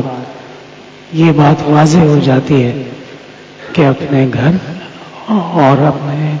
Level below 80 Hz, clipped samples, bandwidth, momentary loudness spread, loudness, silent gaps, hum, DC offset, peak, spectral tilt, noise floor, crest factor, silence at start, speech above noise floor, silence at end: -44 dBFS; under 0.1%; 8 kHz; 21 LU; -11 LUFS; none; none; under 0.1%; 0 dBFS; -7.5 dB/octave; -34 dBFS; 12 dB; 0 s; 24 dB; 0 s